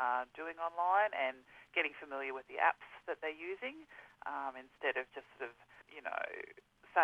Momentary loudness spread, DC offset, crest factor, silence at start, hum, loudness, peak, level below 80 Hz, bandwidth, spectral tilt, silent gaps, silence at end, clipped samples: 16 LU; under 0.1%; 22 dB; 0 s; none; -38 LUFS; -16 dBFS; -80 dBFS; 10.5 kHz; -3.5 dB/octave; none; 0 s; under 0.1%